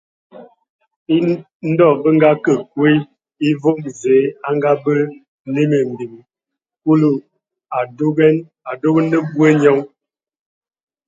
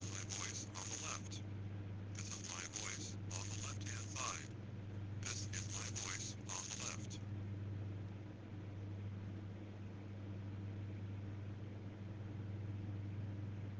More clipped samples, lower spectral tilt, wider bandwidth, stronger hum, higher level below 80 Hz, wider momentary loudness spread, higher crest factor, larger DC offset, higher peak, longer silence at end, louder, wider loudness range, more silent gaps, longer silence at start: neither; first, -7.5 dB/octave vs -4 dB/octave; second, 7.8 kHz vs 10 kHz; neither; about the same, -64 dBFS vs -68 dBFS; first, 12 LU vs 7 LU; about the same, 16 dB vs 20 dB; neither; first, 0 dBFS vs -26 dBFS; first, 1.2 s vs 0 s; first, -16 LUFS vs -47 LUFS; about the same, 3 LU vs 4 LU; first, 0.69-0.79 s, 0.96-1.06 s, 1.55-1.60 s, 5.28-5.45 s vs none; first, 0.35 s vs 0 s